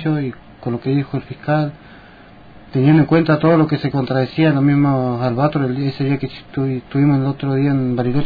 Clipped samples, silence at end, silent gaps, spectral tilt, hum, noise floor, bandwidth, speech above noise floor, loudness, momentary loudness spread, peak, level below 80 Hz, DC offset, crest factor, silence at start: under 0.1%; 0 s; none; -10.5 dB/octave; none; -42 dBFS; 5 kHz; 25 dB; -17 LUFS; 11 LU; -4 dBFS; -48 dBFS; under 0.1%; 14 dB; 0 s